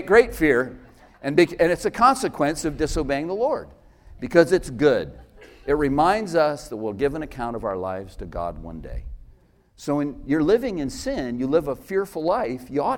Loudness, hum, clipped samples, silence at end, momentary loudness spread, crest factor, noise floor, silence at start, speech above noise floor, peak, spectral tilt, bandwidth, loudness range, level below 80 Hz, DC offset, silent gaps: -23 LUFS; none; under 0.1%; 0 s; 15 LU; 20 dB; -54 dBFS; 0 s; 32 dB; -2 dBFS; -5.5 dB/octave; 17 kHz; 7 LU; -42 dBFS; under 0.1%; none